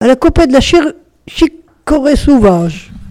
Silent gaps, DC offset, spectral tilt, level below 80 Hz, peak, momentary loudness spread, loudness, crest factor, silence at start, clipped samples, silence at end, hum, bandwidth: none; under 0.1%; -6 dB/octave; -22 dBFS; 0 dBFS; 14 LU; -10 LUFS; 10 dB; 0 s; 0.4%; 0 s; none; 14 kHz